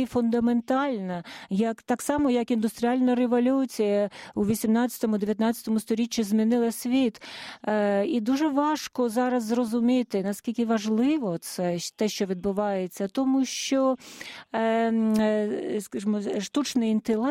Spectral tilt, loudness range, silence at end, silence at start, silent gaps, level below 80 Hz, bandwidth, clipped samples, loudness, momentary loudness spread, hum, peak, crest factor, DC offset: -5 dB/octave; 2 LU; 0 s; 0 s; none; -62 dBFS; 16 kHz; under 0.1%; -26 LUFS; 6 LU; none; -14 dBFS; 12 dB; under 0.1%